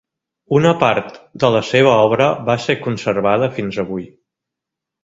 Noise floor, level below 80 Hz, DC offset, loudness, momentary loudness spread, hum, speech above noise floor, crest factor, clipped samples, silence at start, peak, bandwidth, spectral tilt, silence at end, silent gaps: -83 dBFS; -52 dBFS; under 0.1%; -16 LUFS; 10 LU; none; 67 dB; 16 dB; under 0.1%; 0.5 s; 0 dBFS; 7.8 kHz; -6 dB/octave; 1 s; none